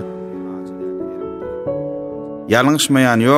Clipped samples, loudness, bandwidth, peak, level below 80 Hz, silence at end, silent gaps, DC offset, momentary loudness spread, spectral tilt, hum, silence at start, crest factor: under 0.1%; -19 LUFS; 16 kHz; 0 dBFS; -52 dBFS; 0 s; none; under 0.1%; 15 LU; -4.5 dB/octave; none; 0 s; 18 dB